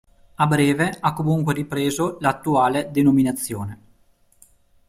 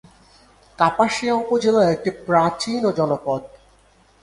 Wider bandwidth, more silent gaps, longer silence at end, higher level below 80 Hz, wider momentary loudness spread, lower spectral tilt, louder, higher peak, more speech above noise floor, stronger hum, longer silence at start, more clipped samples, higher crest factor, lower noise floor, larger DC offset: first, 16 kHz vs 11.5 kHz; neither; first, 1.15 s vs 0.75 s; about the same, -54 dBFS vs -56 dBFS; about the same, 7 LU vs 7 LU; about the same, -6 dB/octave vs -5.5 dB/octave; about the same, -21 LUFS vs -20 LUFS; second, -4 dBFS vs 0 dBFS; about the same, 38 dB vs 36 dB; second, none vs 50 Hz at -55 dBFS; second, 0.4 s vs 0.8 s; neither; about the same, 18 dB vs 20 dB; about the same, -58 dBFS vs -55 dBFS; neither